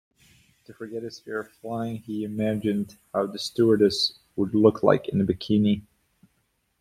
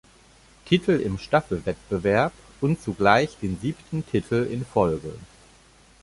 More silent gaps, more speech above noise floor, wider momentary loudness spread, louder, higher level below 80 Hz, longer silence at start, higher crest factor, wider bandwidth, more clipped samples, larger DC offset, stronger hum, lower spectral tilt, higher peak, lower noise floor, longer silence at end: neither; first, 47 dB vs 31 dB; first, 15 LU vs 10 LU; about the same, -25 LUFS vs -24 LUFS; second, -60 dBFS vs -48 dBFS; about the same, 0.7 s vs 0.65 s; about the same, 22 dB vs 22 dB; first, 14.5 kHz vs 11.5 kHz; neither; neither; neither; about the same, -6.5 dB/octave vs -6.5 dB/octave; about the same, -4 dBFS vs -2 dBFS; first, -72 dBFS vs -54 dBFS; first, 1 s vs 0.75 s